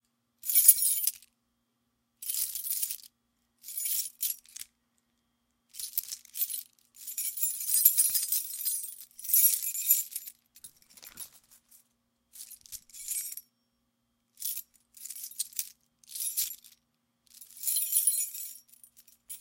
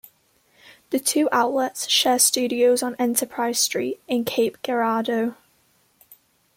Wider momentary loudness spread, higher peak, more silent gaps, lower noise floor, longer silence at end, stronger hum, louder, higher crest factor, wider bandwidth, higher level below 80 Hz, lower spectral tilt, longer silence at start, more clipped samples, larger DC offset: first, 23 LU vs 8 LU; about the same, -2 dBFS vs -4 dBFS; neither; first, -78 dBFS vs -63 dBFS; second, 0 s vs 1.25 s; neither; second, -27 LUFS vs -21 LUFS; first, 30 dB vs 20 dB; about the same, 17 kHz vs 16.5 kHz; second, -80 dBFS vs -70 dBFS; second, 4.5 dB/octave vs -1.5 dB/octave; second, 0.45 s vs 0.9 s; neither; neither